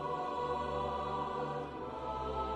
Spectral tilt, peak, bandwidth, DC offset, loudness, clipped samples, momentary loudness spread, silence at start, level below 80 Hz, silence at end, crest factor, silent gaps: -6.5 dB/octave; -24 dBFS; 11.5 kHz; under 0.1%; -38 LUFS; under 0.1%; 5 LU; 0 s; -52 dBFS; 0 s; 14 dB; none